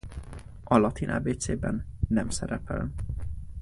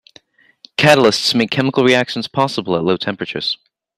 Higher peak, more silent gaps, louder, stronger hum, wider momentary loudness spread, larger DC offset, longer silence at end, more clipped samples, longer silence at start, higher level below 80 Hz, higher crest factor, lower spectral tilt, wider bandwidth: second, -6 dBFS vs 0 dBFS; neither; second, -29 LUFS vs -15 LUFS; neither; first, 18 LU vs 11 LU; neither; second, 0 s vs 0.45 s; neither; second, 0.05 s vs 0.8 s; first, -38 dBFS vs -56 dBFS; first, 22 dB vs 16 dB; first, -6 dB/octave vs -4.5 dB/octave; second, 11.5 kHz vs 16 kHz